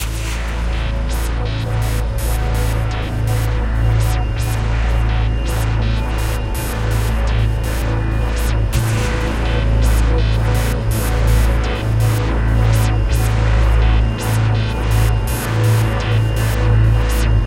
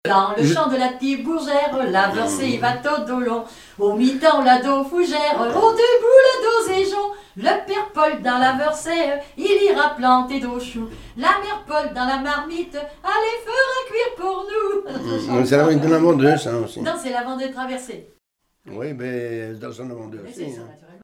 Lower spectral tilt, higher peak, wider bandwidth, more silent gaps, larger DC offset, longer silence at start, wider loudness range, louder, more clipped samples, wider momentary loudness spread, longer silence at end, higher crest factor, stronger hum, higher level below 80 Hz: about the same, -6 dB/octave vs -5 dB/octave; about the same, -2 dBFS vs 0 dBFS; about the same, 16 kHz vs 16 kHz; neither; neither; about the same, 0 s vs 0.05 s; second, 3 LU vs 8 LU; about the same, -18 LUFS vs -19 LUFS; neither; second, 6 LU vs 15 LU; second, 0 s vs 0.3 s; second, 12 dB vs 18 dB; neither; first, -18 dBFS vs -52 dBFS